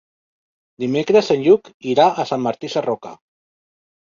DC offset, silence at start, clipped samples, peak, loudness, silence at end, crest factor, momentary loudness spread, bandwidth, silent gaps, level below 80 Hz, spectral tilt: under 0.1%; 0.8 s; under 0.1%; -2 dBFS; -18 LUFS; 1 s; 18 dB; 11 LU; 7.4 kHz; 1.74-1.80 s; -62 dBFS; -6 dB/octave